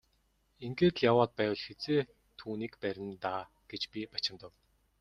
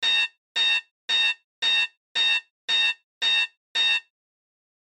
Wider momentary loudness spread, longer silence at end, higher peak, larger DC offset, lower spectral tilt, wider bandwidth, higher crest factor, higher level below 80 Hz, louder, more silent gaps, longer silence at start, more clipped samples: first, 17 LU vs 4 LU; second, 0.55 s vs 0.85 s; about the same, -12 dBFS vs -14 dBFS; neither; first, -6.5 dB/octave vs 3 dB/octave; about the same, 9.4 kHz vs 9.8 kHz; first, 22 dB vs 12 dB; first, -66 dBFS vs -88 dBFS; second, -33 LUFS vs -22 LUFS; second, none vs 0.38-0.55 s, 0.91-1.08 s, 1.44-1.62 s, 1.97-2.15 s, 2.50-2.68 s, 3.04-3.21 s, 3.57-3.75 s; first, 0.6 s vs 0 s; neither